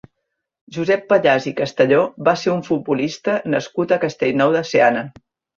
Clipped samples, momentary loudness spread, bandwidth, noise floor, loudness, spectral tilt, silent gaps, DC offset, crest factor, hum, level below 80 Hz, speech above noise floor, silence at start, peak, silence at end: under 0.1%; 7 LU; 7.4 kHz; -77 dBFS; -18 LUFS; -6 dB/octave; none; under 0.1%; 18 dB; none; -60 dBFS; 59 dB; 0.7 s; -2 dBFS; 0.5 s